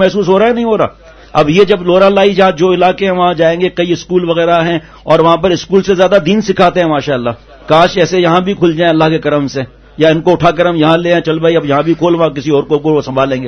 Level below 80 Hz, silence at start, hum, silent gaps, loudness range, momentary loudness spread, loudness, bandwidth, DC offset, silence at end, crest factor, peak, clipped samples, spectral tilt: -40 dBFS; 0 s; none; none; 1 LU; 6 LU; -10 LUFS; 7.2 kHz; under 0.1%; 0 s; 10 dB; 0 dBFS; 0.5%; -6 dB/octave